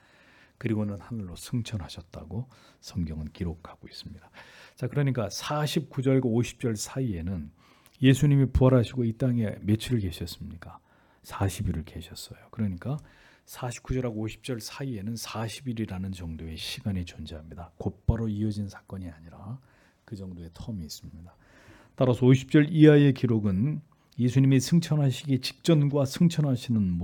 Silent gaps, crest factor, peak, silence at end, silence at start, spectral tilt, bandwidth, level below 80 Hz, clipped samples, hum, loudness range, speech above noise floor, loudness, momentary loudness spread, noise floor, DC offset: none; 22 dB; -6 dBFS; 0 s; 0.65 s; -7 dB/octave; 18 kHz; -46 dBFS; under 0.1%; none; 12 LU; 31 dB; -27 LUFS; 21 LU; -58 dBFS; under 0.1%